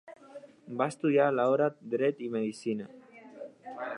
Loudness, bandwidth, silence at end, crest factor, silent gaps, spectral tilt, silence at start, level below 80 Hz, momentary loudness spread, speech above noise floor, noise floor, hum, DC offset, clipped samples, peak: -30 LUFS; 11 kHz; 0 s; 18 dB; none; -6.5 dB/octave; 0.05 s; -84 dBFS; 23 LU; 22 dB; -51 dBFS; none; under 0.1%; under 0.1%; -12 dBFS